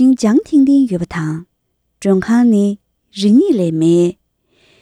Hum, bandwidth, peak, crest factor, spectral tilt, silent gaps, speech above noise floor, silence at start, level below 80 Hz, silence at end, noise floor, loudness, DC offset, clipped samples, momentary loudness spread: none; 11 kHz; -2 dBFS; 12 dB; -7 dB/octave; none; 55 dB; 0 s; -50 dBFS; 0.7 s; -67 dBFS; -13 LUFS; under 0.1%; under 0.1%; 11 LU